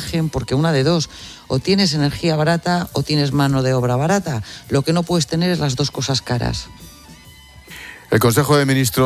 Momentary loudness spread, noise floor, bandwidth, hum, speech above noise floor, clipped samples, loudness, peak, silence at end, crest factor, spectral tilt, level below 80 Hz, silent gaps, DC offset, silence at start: 12 LU; -43 dBFS; 16 kHz; none; 25 dB; under 0.1%; -18 LUFS; -2 dBFS; 0 s; 16 dB; -5.5 dB/octave; -40 dBFS; none; under 0.1%; 0 s